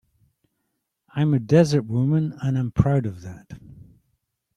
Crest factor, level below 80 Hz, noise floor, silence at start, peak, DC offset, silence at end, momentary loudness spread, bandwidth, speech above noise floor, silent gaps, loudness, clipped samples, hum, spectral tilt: 20 dB; -48 dBFS; -77 dBFS; 1.15 s; -2 dBFS; under 0.1%; 0.85 s; 22 LU; 10.5 kHz; 56 dB; none; -21 LUFS; under 0.1%; none; -8 dB/octave